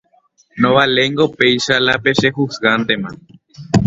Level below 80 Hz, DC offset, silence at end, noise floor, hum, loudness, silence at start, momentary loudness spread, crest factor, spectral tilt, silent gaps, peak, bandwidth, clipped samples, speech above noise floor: -44 dBFS; under 0.1%; 0 s; -56 dBFS; none; -14 LUFS; 0.55 s; 6 LU; 16 dB; -5 dB/octave; none; 0 dBFS; 8 kHz; under 0.1%; 41 dB